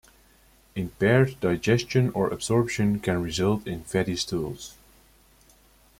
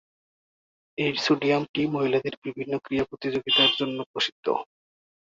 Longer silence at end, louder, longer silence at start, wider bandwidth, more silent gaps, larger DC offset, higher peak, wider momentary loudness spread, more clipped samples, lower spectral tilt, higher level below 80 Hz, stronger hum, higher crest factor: first, 1.25 s vs 0.55 s; about the same, -25 LUFS vs -25 LUFS; second, 0.75 s vs 1 s; first, 16.5 kHz vs 7.8 kHz; second, none vs 1.69-1.74 s, 2.37-2.42 s, 4.06-4.14 s, 4.32-4.43 s; neither; about the same, -8 dBFS vs -8 dBFS; about the same, 13 LU vs 12 LU; neither; first, -6 dB/octave vs -4.5 dB/octave; first, -52 dBFS vs -64 dBFS; neither; about the same, 20 dB vs 20 dB